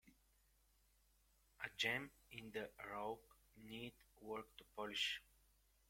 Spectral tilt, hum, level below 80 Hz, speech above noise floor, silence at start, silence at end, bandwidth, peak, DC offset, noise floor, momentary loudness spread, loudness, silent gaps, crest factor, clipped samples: -2.5 dB/octave; none; -76 dBFS; 28 dB; 0.05 s; 0.65 s; 16.5 kHz; -26 dBFS; under 0.1%; -77 dBFS; 15 LU; -47 LUFS; none; 24 dB; under 0.1%